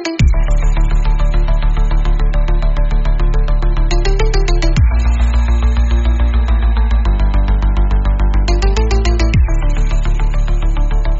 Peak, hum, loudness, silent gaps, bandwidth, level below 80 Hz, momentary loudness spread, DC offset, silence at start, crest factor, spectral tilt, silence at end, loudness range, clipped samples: -2 dBFS; none; -16 LUFS; none; 7.8 kHz; -12 dBFS; 4 LU; under 0.1%; 0 s; 10 dB; -6 dB/octave; 0 s; 2 LU; under 0.1%